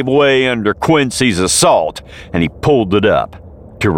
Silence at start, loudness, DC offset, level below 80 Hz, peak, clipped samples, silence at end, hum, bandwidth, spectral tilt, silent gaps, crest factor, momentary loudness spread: 0 s; -13 LUFS; 0.3%; -38 dBFS; 0 dBFS; under 0.1%; 0 s; none; 17.5 kHz; -4 dB/octave; none; 12 dB; 10 LU